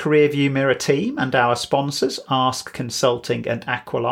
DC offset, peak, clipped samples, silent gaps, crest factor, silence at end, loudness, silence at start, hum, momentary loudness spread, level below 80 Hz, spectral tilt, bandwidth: under 0.1%; -4 dBFS; under 0.1%; none; 16 dB; 0 s; -20 LUFS; 0 s; none; 6 LU; -58 dBFS; -4.5 dB/octave; 16.5 kHz